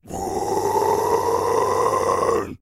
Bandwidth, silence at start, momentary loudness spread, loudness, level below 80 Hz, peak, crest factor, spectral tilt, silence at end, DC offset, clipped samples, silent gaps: 16 kHz; 0.05 s; 4 LU; -21 LUFS; -48 dBFS; -6 dBFS; 14 dB; -4.5 dB/octave; 0.05 s; under 0.1%; under 0.1%; none